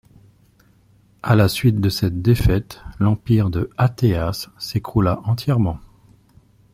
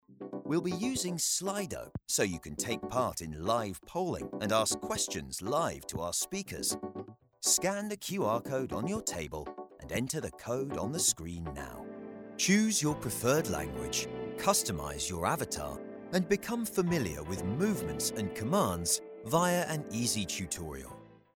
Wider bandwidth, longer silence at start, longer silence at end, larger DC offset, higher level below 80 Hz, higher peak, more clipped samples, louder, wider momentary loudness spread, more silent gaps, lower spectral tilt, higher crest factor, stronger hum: second, 16 kHz vs 18.5 kHz; first, 1.25 s vs 0.1 s; first, 0.9 s vs 0.2 s; neither; first, -36 dBFS vs -56 dBFS; first, -2 dBFS vs -12 dBFS; neither; first, -19 LUFS vs -32 LUFS; second, 9 LU vs 12 LU; neither; first, -7 dB/octave vs -3.5 dB/octave; about the same, 18 dB vs 22 dB; neither